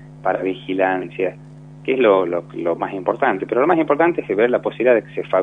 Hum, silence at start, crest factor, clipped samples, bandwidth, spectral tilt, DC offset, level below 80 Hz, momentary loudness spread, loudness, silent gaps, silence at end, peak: none; 0 s; 18 dB; under 0.1%; 3.9 kHz; -8 dB/octave; under 0.1%; -58 dBFS; 8 LU; -19 LUFS; none; 0 s; -2 dBFS